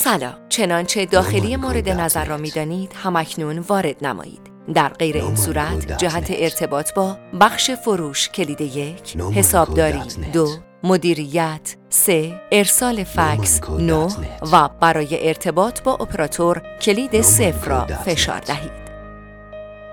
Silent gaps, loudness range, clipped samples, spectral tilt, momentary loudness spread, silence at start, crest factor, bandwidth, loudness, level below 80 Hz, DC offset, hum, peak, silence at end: none; 4 LU; under 0.1%; -3.5 dB/octave; 12 LU; 0 s; 18 dB; 19 kHz; -18 LUFS; -34 dBFS; under 0.1%; none; 0 dBFS; 0 s